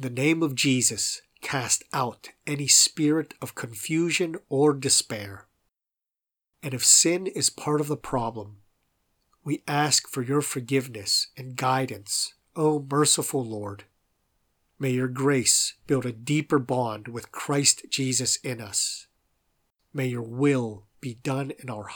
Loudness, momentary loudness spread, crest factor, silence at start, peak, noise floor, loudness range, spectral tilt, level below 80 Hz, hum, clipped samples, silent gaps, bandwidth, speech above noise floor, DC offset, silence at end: -24 LUFS; 15 LU; 24 dB; 0 s; -4 dBFS; -90 dBFS; 4 LU; -3 dB/octave; -64 dBFS; none; under 0.1%; none; over 20 kHz; 64 dB; under 0.1%; 0 s